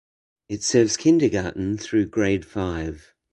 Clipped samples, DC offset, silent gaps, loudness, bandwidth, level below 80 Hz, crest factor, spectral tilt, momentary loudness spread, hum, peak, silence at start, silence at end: under 0.1%; under 0.1%; none; -22 LUFS; 11 kHz; -44 dBFS; 18 dB; -5 dB/octave; 13 LU; none; -6 dBFS; 0.5 s; 0.35 s